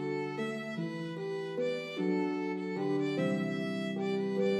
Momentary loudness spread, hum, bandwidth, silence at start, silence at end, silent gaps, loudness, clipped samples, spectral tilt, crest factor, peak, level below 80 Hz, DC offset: 6 LU; none; 12 kHz; 0 s; 0 s; none; -34 LUFS; under 0.1%; -7 dB/octave; 14 dB; -20 dBFS; -84 dBFS; under 0.1%